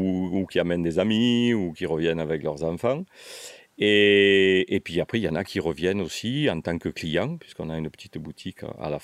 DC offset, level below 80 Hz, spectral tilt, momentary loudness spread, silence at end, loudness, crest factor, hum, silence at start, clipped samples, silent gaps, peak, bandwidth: under 0.1%; -56 dBFS; -5.5 dB/octave; 19 LU; 0.05 s; -24 LUFS; 18 dB; none; 0 s; under 0.1%; none; -6 dBFS; 13.5 kHz